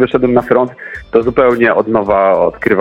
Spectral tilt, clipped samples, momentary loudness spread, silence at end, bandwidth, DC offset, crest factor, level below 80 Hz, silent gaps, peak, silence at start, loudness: -8 dB/octave; under 0.1%; 5 LU; 0 s; 5.6 kHz; under 0.1%; 12 dB; -40 dBFS; none; 0 dBFS; 0 s; -12 LUFS